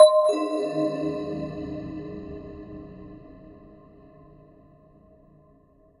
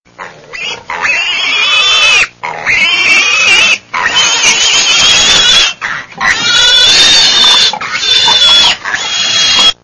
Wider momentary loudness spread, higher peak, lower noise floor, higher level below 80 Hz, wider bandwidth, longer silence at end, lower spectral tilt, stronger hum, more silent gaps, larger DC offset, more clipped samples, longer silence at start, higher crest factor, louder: first, 24 LU vs 11 LU; about the same, -2 dBFS vs 0 dBFS; first, -58 dBFS vs -29 dBFS; second, -54 dBFS vs -40 dBFS; about the same, 11 kHz vs 11 kHz; first, 2.45 s vs 0.1 s; first, -5.5 dB/octave vs 1.5 dB/octave; neither; neither; neither; second, under 0.1% vs 1%; second, 0 s vs 0.2 s; first, 24 dB vs 8 dB; second, -26 LUFS vs -5 LUFS